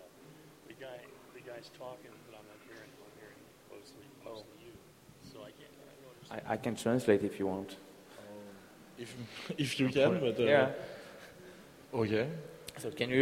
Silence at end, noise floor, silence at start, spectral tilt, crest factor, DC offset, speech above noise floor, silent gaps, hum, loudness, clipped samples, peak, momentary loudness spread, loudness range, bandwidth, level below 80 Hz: 0 s; -57 dBFS; 0 s; -5.5 dB/octave; 24 dB; under 0.1%; 22 dB; none; none; -33 LUFS; under 0.1%; -14 dBFS; 26 LU; 20 LU; 16 kHz; -70 dBFS